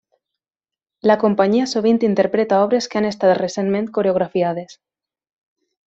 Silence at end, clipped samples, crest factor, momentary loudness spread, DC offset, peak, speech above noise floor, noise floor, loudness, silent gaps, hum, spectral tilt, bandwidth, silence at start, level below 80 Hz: 1.15 s; under 0.1%; 18 dB; 5 LU; under 0.1%; -2 dBFS; over 73 dB; under -90 dBFS; -18 LUFS; none; none; -6 dB/octave; 8 kHz; 1.05 s; -62 dBFS